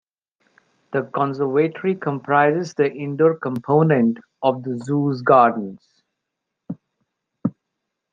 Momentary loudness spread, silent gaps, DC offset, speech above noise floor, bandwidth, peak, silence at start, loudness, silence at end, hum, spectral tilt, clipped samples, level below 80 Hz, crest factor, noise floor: 13 LU; none; under 0.1%; 62 dB; 7.6 kHz; -2 dBFS; 0.9 s; -20 LUFS; 0.65 s; none; -8 dB/octave; under 0.1%; -68 dBFS; 20 dB; -81 dBFS